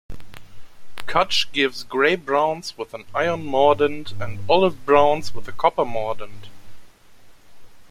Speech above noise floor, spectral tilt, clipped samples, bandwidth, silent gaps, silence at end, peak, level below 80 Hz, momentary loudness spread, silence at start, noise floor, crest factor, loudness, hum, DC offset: 29 dB; -4.5 dB/octave; under 0.1%; 16 kHz; none; 0.05 s; -4 dBFS; -50 dBFS; 16 LU; 0.1 s; -48 dBFS; 18 dB; -21 LUFS; none; under 0.1%